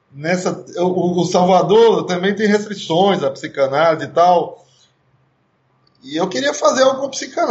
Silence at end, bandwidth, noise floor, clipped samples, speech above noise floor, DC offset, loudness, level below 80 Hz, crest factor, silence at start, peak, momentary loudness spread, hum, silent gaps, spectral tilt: 0 s; 8.2 kHz; -61 dBFS; under 0.1%; 45 dB; under 0.1%; -16 LUFS; -66 dBFS; 14 dB; 0.15 s; -2 dBFS; 10 LU; none; none; -5 dB/octave